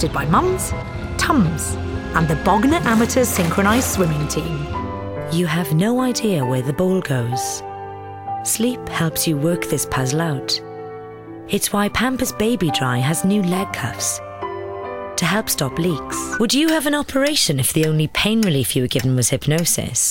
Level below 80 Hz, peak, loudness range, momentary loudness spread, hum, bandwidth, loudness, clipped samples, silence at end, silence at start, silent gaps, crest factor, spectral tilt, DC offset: -38 dBFS; -2 dBFS; 4 LU; 11 LU; none; 17.5 kHz; -19 LUFS; under 0.1%; 0 s; 0 s; none; 18 dB; -4.5 dB/octave; under 0.1%